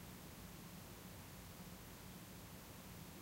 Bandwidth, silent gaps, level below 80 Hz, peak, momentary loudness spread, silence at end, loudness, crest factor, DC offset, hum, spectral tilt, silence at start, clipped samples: 16 kHz; none; -66 dBFS; -42 dBFS; 0 LU; 0 s; -55 LUFS; 14 dB; under 0.1%; none; -4 dB/octave; 0 s; under 0.1%